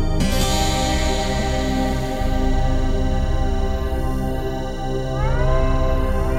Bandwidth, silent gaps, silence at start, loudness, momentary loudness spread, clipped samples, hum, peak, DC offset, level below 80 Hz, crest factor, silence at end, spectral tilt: 15 kHz; none; 0 s; -22 LUFS; 5 LU; under 0.1%; none; -6 dBFS; 0.2%; -20 dBFS; 12 dB; 0 s; -5.5 dB/octave